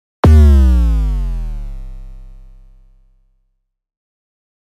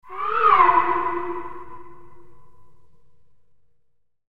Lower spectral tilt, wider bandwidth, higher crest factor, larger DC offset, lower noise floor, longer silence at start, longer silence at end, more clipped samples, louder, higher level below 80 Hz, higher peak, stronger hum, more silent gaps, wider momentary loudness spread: first, -8.5 dB/octave vs -6.5 dB/octave; first, 6.4 kHz vs 5.2 kHz; second, 14 dB vs 22 dB; second, under 0.1% vs 2%; about the same, -66 dBFS vs -67 dBFS; first, 0.25 s vs 0 s; first, 2.5 s vs 0 s; neither; first, -12 LUFS vs -19 LUFS; first, -16 dBFS vs -56 dBFS; about the same, -2 dBFS vs -2 dBFS; neither; neither; first, 24 LU vs 21 LU